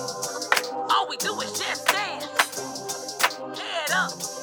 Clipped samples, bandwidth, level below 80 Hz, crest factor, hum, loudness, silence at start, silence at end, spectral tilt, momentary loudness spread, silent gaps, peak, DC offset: under 0.1%; over 20 kHz; -74 dBFS; 26 dB; none; -25 LUFS; 0 s; 0 s; -0.5 dB/octave; 8 LU; none; 0 dBFS; under 0.1%